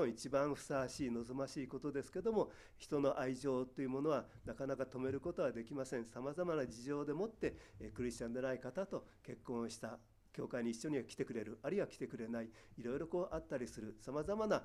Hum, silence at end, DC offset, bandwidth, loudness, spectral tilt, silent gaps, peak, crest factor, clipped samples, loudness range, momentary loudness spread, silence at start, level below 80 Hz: none; 0 s; under 0.1%; 14 kHz; -42 LUFS; -6 dB/octave; none; -22 dBFS; 20 dB; under 0.1%; 4 LU; 10 LU; 0 s; -66 dBFS